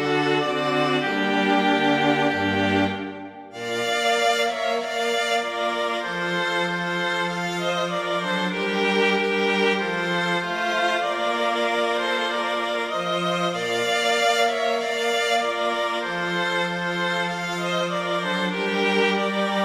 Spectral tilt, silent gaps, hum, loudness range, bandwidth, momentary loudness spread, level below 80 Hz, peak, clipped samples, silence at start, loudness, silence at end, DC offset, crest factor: -4 dB/octave; none; none; 2 LU; 16 kHz; 5 LU; -64 dBFS; -6 dBFS; under 0.1%; 0 s; -22 LUFS; 0 s; under 0.1%; 16 dB